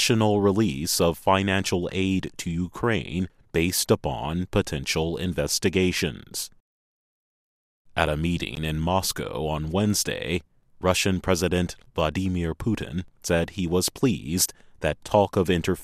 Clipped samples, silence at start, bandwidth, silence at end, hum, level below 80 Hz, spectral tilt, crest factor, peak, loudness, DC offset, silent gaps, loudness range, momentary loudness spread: under 0.1%; 0 s; 15.5 kHz; 0 s; none; -44 dBFS; -4.5 dB/octave; 22 dB; -2 dBFS; -25 LUFS; under 0.1%; 6.60-7.85 s; 3 LU; 8 LU